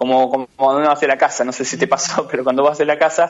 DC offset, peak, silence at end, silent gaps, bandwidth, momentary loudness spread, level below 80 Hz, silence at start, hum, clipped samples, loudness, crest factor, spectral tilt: under 0.1%; 0 dBFS; 0 s; none; 8 kHz; 4 LU; -64 dBFS; 0 s; none; under 0.1%; -16 LUFS; 16 dB; -3 dB/octave